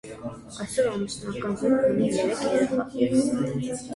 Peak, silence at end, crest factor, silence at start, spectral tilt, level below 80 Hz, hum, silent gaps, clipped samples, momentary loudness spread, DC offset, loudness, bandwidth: -10 dBFS; 0 s; 16 dB; 0.05 s; -5.5 dB/octave; -56 dBFS; none; none; under 0.1%; 12 LU; under 0.1%; -25 LUFS; 11.5 kHz